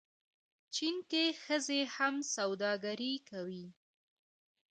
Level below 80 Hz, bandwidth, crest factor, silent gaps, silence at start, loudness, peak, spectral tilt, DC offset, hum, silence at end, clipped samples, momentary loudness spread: -88 dBFS; 9.4 kHz; 20 dB; none; 0.7 s; -36 LUFS; -18 dBFS; -2.5 dB/octave; under 0.1%; none; 1 s; under 0.1%; 11 LU